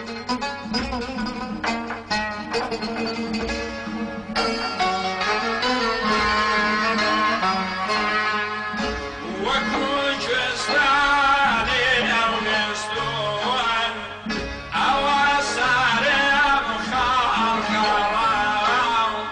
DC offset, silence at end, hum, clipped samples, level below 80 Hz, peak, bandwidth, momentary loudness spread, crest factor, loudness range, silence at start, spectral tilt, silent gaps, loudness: under 0.1%; 0 s; none; under 0.1%; -44 dBFS; -8 dBFS; 11 kHz; 9 LU; 14 dB; 7 LU; 0 s; -3 dB/octave; none; -21 LUFS